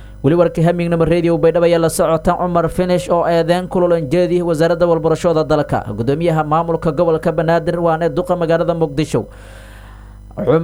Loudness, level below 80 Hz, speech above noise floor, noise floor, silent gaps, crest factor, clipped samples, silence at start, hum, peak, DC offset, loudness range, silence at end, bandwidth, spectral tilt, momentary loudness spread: -15 LUFS; -36 dBFS; 21 dB; -35 dBFS; none; 14 dB; under 0.1%; 0 s; 50 Hz at -40 dBFS; 0 dBFS; under 0.1%; 3 LU; 0 s; 14.5 kHz; -7 dB/octave; 4 LU